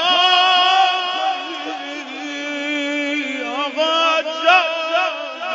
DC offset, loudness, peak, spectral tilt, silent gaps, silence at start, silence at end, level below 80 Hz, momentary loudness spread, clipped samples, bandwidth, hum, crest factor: under 0.1%; -17 LUFS; 0 dBFS; -0.5 dB/octave; none; 0 s; 0 s; -82 dBFS; 14 LU; under 0.1%; 7.8 kHz; none; 18 dB